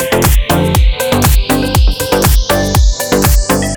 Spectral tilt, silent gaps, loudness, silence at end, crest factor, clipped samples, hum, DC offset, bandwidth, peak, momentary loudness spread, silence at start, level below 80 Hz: -4.5 dB/octave; none; -11 LUFS; 0 s; 10 dB; under 0.1%; none; under 0.1%; over 20 kHz; 0 dBFS; 2 LU; 0 s; -12 dBFS